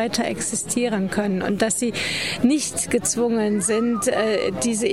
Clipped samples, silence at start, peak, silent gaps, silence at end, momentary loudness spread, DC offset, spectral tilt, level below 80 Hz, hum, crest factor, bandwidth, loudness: under 0.1%; 0 s; -6 dBFS; none; 0 s; 3 LU; 0.3%; -3.5 dB/octave; -54 dBFS; none; 16 dB; 16 kHz; -21 LUFS